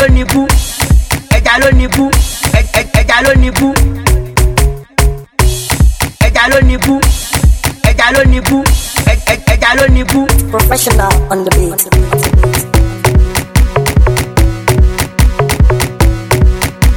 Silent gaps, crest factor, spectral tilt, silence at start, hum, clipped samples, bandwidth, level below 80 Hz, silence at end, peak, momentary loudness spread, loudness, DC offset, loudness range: none; 8 dB; -4.5 dB/octave; 0 s; none; 2%; 18 kHz; -12 dBFS; 0 s; 0 dBFS; 4 LU; -10 LUFS; under 0.1%; 1 LU